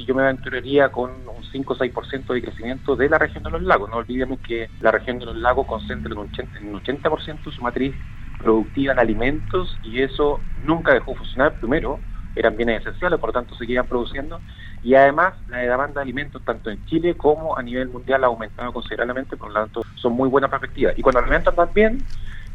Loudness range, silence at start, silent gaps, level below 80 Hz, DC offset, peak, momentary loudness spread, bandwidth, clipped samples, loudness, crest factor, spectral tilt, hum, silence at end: 4 LU; 0 s; none; -32 dBFS; under 0.1%; -2 dBFS; 12 LU; 6.8 kHz; under 0.1%; -21 LUFS; 20 dB; -7.5 dB/octave; none; 0 s